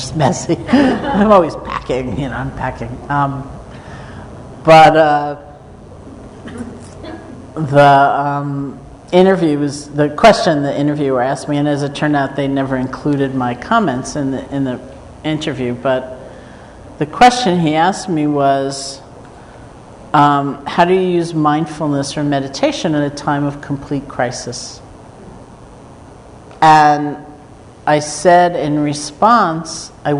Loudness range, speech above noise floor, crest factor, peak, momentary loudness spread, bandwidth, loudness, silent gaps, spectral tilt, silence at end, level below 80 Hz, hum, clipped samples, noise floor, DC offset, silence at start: 5 LU; 24 dB; 14 dB; 0 dBFS; 21 LU; 11 kHz; -14 LUFS; none; -5.5 dB/octave; 0 s; -42 dBFS; none; under 0.1%; -38 dBFS; under 0.1%; 0 s